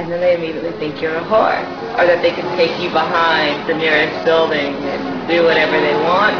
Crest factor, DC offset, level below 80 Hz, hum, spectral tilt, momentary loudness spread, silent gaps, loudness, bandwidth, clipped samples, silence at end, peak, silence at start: 16 dB; under 0.1%; -50 dBFS; none; -5.5 dB/octave; 8 LU; none; -15 LUFS; 5.4 kHz; under 0.1%; 0 s; 0 dBFS; 0 s